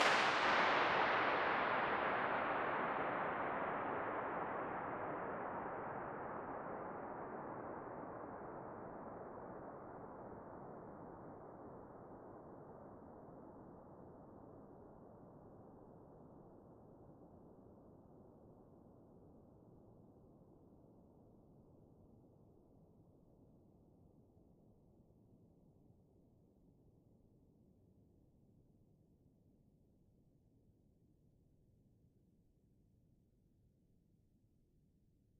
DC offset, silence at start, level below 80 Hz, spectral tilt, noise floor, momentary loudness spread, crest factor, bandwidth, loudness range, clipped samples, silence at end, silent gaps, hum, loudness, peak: under 0.1%; 0 s; -74 dBFS; -1.5 dB/octave; -75 dBFS; 27 LU; 28 dB; 6.6 kHz; 26 LU; under 0.1%; 8.5 s; none; none; -41 LUFS; -18 dBFS